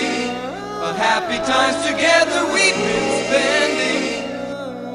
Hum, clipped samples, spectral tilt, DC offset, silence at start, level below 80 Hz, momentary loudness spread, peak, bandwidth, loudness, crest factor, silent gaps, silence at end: none; under 0.1%; -2.5 dB/octave; under 0.1%; 0 s; -52 dBFS; 12 LU; -2 dBFS; 13.5 kHz; -18 LUFS; 18 dB; none; 0 s